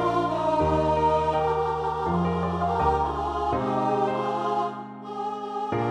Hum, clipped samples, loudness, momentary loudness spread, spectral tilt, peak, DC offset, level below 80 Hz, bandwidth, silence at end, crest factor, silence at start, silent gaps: none; under 0.1%; -25 LUFS; 9 LU; -7.5 dB/octave; -10 dBFS; under 0.1%; -42 dBFS; 10.5 kHz; 0 s; 14 dB; 0 s; none